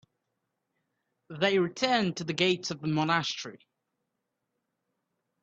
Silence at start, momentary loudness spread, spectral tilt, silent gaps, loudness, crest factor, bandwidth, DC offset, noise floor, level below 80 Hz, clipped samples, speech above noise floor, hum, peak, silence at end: 1.3 s; 10 LU; -4.5 dB/octave; none; -28 LUFS; 24 dB; 8.2 kHz; under 0.1%; -83 dBFS; -72 dBFS; under 0.1%; 55 dB; none; -8 dBFS; 1.85 s